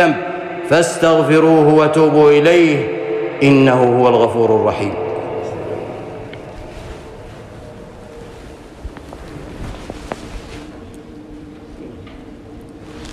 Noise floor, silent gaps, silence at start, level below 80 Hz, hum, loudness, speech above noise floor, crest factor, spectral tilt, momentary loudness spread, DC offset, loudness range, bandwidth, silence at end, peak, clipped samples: -35 dBFS; none; 0 s; -40 dBFS; none; -13 LUFS; 24 dB; 14 dB; -6 dB/octave; 25 LU; under 0.1%; 22 LU; 12.5 kHz; 0 s; -2 dBFS; under 0.1%